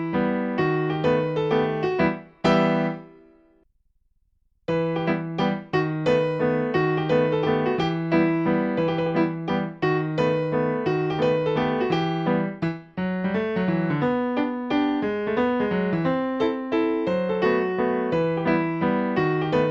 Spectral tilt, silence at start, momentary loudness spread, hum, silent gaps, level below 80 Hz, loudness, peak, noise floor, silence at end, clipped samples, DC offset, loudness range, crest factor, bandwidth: -8 dB/octave; 0 s; 4 LU; none; none; -56 dBFS; -24 LUFS; -6 dBFS; -66 dBFS; 0 s; under 0.1%; under 0.1%; 3 LU; 16 dB; 7.4 kHz